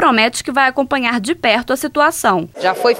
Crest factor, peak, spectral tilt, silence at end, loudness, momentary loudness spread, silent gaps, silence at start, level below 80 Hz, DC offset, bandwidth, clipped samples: 14 dB; 0 dBFS; -3 dB/octave; 0 s; -15 LUFS; 4 LU; none; 0 s; -50 dBFS; under 0.1%; 17 kHz; under 0.1%